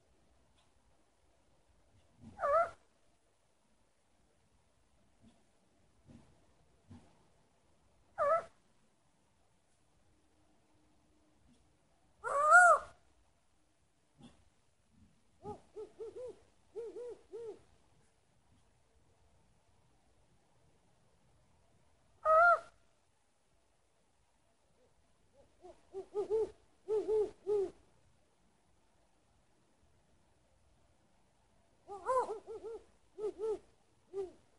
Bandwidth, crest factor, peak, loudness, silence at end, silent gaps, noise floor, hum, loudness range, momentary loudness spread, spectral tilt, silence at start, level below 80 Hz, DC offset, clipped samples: 11.5 kHz; 28 dB; -12 dBFS; -32 LUFS; 0.3 s; none; -77 dBFS; none; 21 LU; 25 LU; -3.5 dB/octave; 2.25 s; -74 dBFS; under 0.1%; under 0.1%